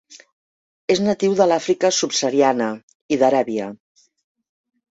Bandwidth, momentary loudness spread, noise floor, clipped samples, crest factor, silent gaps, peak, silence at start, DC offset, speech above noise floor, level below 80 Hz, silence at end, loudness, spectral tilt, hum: 8 kHz; 10 LU; under -90 dBFS; under 0.1%; 18 dB; 0.33-0.88 s, 2.83-2.88 s, 2.95-3.09 s; -2 dBFS; 0.1 s; under 0.1%; over 72 dB; -66 dBFS; 1.2 s; -19 LUFS; -4 dB/octave; none